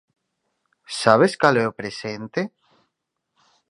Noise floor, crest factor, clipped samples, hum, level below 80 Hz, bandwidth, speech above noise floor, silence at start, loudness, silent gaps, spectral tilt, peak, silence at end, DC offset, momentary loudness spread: -78 dBFS; 24 dB; under 0.1%; none; -66 dBFS; 11.5 kHz; 59 dB; 0.9 s; -20 LUFS; none; -5 dB/octave; 0 dBFS; 1.2 s; under 0.1%; 15 LU